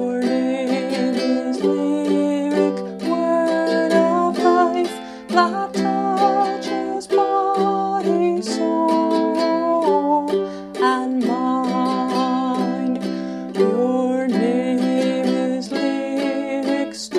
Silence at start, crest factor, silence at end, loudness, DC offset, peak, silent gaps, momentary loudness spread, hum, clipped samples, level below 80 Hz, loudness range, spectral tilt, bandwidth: 0 s; 16 dB; 0 s; -20 LUFS; under 0.1%; -2 dBFS; none; 5 LU; none; under 0.1%; -62 dBFS; 2 LU; -5.5 dB/octave; 12 kHz